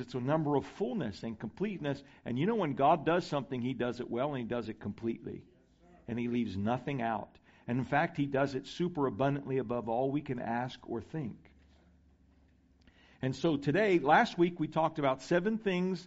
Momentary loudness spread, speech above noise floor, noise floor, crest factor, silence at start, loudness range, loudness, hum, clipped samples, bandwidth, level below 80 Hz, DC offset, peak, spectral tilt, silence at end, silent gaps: 13 LU; 33 dB; -65 dBFS; 20 dB; 0 s; 7 LU; -33 LUFS; none; under 0.1%; 8 kHz; -64 dBFS; under 0.1%; -14 dBFS; -5.5 dB/octave; 0 s; none